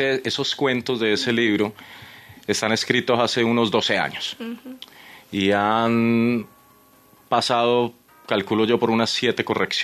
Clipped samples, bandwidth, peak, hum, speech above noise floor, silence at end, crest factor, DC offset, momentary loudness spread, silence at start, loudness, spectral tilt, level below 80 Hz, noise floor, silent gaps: under 0.1%; 13.5 kHz; -4 dBFS; none; 32 dB; 0 s; 18 dB; under 0.1%; 15 LU; 0 s; -21 LUFS; -4.5 dB/octave; -66 dBFS; -54 dBFS; none